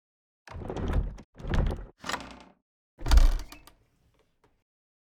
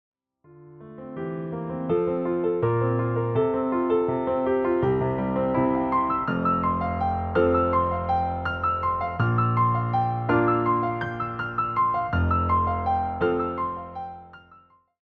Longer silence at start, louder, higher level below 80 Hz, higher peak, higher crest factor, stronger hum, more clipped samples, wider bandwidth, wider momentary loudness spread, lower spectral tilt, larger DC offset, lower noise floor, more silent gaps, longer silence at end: about the same, 0.55 s vs 0.55 s; second, -31 LUFS vs -24 LUFS; first, -30 dBFS vs -48 dBFS; first, -6 dBFS vs -10 dBFS; first, 22 dB vs 16 dB; neither; neither; first, 13.5 kHz vs 4.6 kHz; first, 22 LU vs 9 LU; second, -5.5 dB/octave vs -10.5 dB/octave; neither; first, -68 dBFS vs -56 dBFS; first, 1.24-1.33 s, 2.62-2.98 s vs none; first, 1.65 s vs 0.65 s